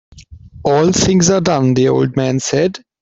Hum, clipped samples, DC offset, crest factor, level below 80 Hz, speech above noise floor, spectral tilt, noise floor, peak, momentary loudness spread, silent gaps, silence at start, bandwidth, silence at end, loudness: none; under 0.1%; under 0.1%; 14 dB; -42 dBFS; 24 dB; -5 dB/octave; -37 dBFS; 0 dBFS; 5 LU; none; 0.15 s; 8 kHz; 0.25 s; -14 LUFS